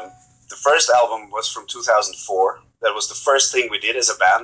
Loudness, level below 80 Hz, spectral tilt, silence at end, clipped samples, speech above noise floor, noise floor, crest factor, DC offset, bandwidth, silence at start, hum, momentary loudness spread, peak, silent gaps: -18 LUFS; -64 dBFS; 0.5 dB/octave; 0 s; under 0.1%; 23 dB; -42 dBFS; 18 dB; under 0.1%; 8 kHz; 0 s; none; 10 LU; -2 dBFS; none